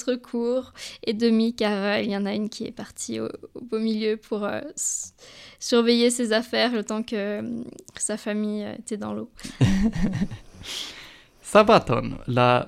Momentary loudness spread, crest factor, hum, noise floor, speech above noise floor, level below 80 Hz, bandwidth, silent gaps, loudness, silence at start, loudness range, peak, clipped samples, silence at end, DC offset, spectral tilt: 15 LU; 22 dB; none; -46 dBFS; 22 dB; -44 dBFS; 14 kHz; none; -25 LUFS; 0 s; 5 LU; -2 dBFS; under 0.1%; 0 s; under 0.1%; -4.5 dB/octave